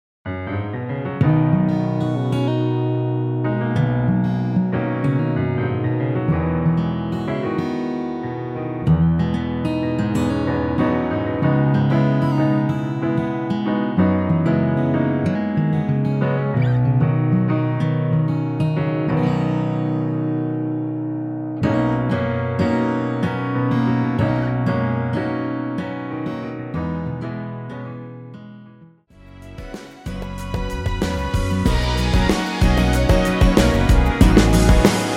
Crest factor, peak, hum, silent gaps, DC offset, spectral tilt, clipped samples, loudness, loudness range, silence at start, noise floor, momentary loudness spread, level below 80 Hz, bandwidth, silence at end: 18 dB; 0 dBFS; none; none; under 0.1%; -7 dB/octave; under 0.1%; -20 LUFS; 8 LU; 0.25 s; -47 dBFS; 10 LU; -28 dBFS; 15.5 kHz; 0 s